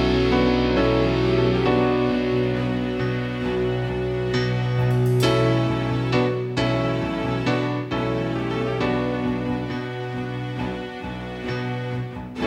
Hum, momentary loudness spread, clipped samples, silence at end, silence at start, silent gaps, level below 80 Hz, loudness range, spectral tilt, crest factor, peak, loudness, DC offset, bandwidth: none; 9 LU; under 0.1%; 0 s; 0 s; none; -38 dBFS; 5 LU; -7 dB/octave; 16 dB; -6 dBFS; -23 LUFS; under 0.1%; 12.5 kHz